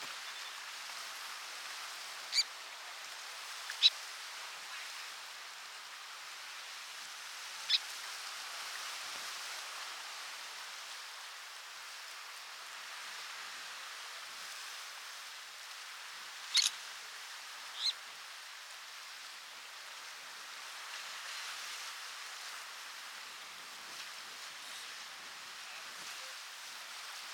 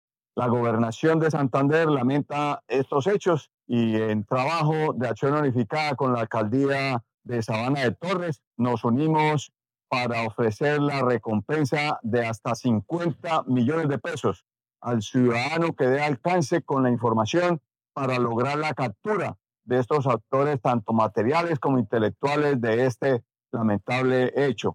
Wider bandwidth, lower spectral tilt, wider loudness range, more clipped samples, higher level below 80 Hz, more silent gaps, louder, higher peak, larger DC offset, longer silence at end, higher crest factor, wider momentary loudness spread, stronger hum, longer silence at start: first, 19 kHz vs 11.5 kHz; second, 3.5 dB/octave vs -7 dB/octave; first, 10 LU vs 2 LU; neither; second, under -90 dBFS vs -74 dBFS; second, none vs 3.54-3.58 s, 7.14-7.18 s, 8.47-8.51 s; second, -40 LUFS vs -24 LUFS; second, -12 dBFS vs -8 dBFS; neither; about the same, 0 s vs 0 s; first, 30 dB vs 16 dB; first, 13 LU vs 6 LU; neither; second, 0 s vs 0.35 s